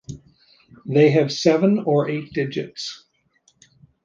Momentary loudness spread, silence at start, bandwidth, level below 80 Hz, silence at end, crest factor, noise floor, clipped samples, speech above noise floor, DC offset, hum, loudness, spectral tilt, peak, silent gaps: 23 LU; 0.1 s; 7.6 kHz; -60 dBFS; 1.1 s; 18 dB; -63 dBFS; under 0.1%; 44 dB; under 0.1%; none; -20 LUFS; -6.5 dB/octave; -4 dBFS; none